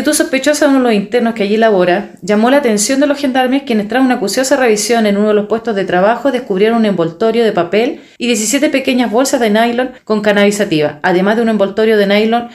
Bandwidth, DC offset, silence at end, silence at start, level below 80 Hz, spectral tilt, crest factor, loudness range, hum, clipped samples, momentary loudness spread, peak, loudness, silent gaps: 16 kHz; under 0.1%; 0 s; 0 s; -54 dBFS; -4 dB/octave; 12 dB; 1 LU; none; under 0.1%; 4 LU; 0 dBFS; -12 LUFS; none